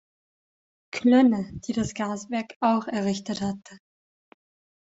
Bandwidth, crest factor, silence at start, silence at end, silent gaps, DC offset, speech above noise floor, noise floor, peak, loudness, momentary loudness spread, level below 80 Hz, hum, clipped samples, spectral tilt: 8 kHz; 20 dB; 0.95 s; 1.15 s; 2.56-2.60 s; under 0.1%; over 66 dB; under -90 dBFS; -8 dBFS; -25 LUFS; 13 LU; -60 dBFS; none; under 0.1%; -5.5 dB/octave